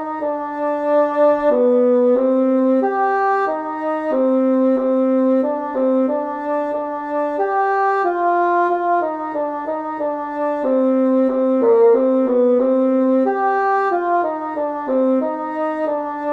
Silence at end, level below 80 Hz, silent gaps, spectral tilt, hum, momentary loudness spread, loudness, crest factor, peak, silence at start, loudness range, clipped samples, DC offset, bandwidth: 0 s; -58 dBFS; none; -7 dB/octave; none; 8 LU; -18 LUFS; 12 dB; -6 dBFS; 0 s; 3 LU; under 0.1%; under 0.1%; 4.6 kHz